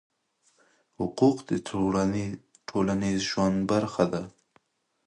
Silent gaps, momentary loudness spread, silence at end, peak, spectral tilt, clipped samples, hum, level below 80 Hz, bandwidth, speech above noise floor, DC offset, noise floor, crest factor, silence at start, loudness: none; 11 LU; 0.75 s; -8 dBFS; -6 dB/octave; under 0.1%; none; -56 dBFS; 10.5 kHz; 43 dB; under 0.1%; -69 dBFS; 20 dB; 1 s; -27 LUFS